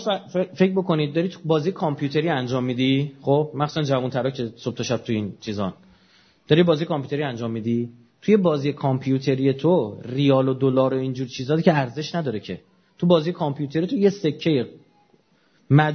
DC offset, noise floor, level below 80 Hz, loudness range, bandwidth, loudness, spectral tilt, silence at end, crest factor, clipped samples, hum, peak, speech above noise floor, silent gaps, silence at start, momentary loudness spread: under 0.1%; -61 dBFS; -64 dBFS; 3 LU; 6.6 kHz; -22 LUFS; -7 dB/octave; 0 s; 20 dB; under 0.1%; none; -2 dBFS; 40 dB; none; 0 s; 9 LU